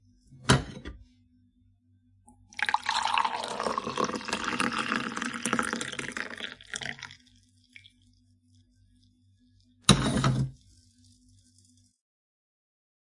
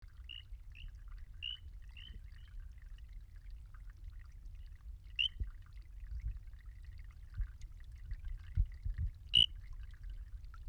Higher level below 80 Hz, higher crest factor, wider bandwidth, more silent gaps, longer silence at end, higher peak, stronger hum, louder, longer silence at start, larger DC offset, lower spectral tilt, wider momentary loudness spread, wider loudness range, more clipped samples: second, -52 dBFS vs -46 dBFS; about the same, 30 dB vs 26 dB; first, 11.5 kHz vs 9.8 kHz; neither; first, 2.5 s vs 0 s; first, -2 dBFS vs -16 dBFS; neither; first, -29 LUFS vs -38 LUFS; first, 0.3 s vs 0 s; neither; first, -4 dB/octave vs -2.5 dB/octave; second, 14 LU vs 20 LU; second, 10 LU vs 14 LU; neither